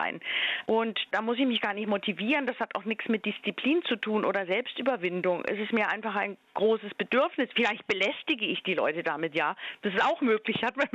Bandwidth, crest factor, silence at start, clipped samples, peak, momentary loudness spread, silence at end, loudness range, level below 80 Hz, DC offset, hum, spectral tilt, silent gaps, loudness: 8 kHz; 16 dB; 0 s; under 0.1%; -14 dBFS; 4 LU; 0.05 s; 1 LU; -74 dBFS; under 0.1%; none; -5.5 dB/octave; none; -28 LUFS